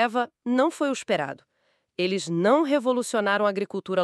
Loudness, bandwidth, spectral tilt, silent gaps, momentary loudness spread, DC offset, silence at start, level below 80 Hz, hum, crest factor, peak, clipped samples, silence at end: -25 LUFS; 13 kHz; -5 dB/octave; none; 9 LU; under 0.1%; 0 s; -80 dBFS; none; 16 dB; -8 dBFS; under 0.1%; 0 s